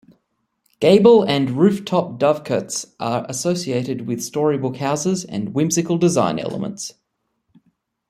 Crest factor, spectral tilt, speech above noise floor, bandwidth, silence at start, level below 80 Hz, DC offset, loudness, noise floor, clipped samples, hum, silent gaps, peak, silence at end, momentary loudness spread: 18 dB; -5.5 dB/octave; 53 dB; 15 kHz; 0.8 s; -60 dBFS; under 0.1%; -19 LUFS; -71 dBFS; under 0.1%; none; none; -2 dBFS; 1.2 s; 12 LU